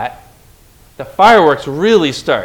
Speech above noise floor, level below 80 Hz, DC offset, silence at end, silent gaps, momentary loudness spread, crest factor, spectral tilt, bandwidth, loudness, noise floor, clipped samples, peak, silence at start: 34 dB; -46 dBFS; under 0.1%; 0 s; none; 18 LU; 12 dB; -5 dB/octave; 17.5 kHz; -10 LUFS; -44 dBFS; 0.9%; 0 dBFS; 0 s